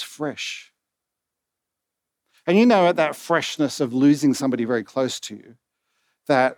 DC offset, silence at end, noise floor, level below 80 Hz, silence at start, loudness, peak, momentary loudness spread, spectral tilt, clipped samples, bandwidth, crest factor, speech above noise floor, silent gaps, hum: under 0.1%; 0.05 s; -84 dBFS; -82 dBFS; 0 s; -21 LUFS; -4 dBFS; 15 LU; -5 dB/octave; under 0.1%; 16.5 kHz; 18 dB; 63 dB; none; none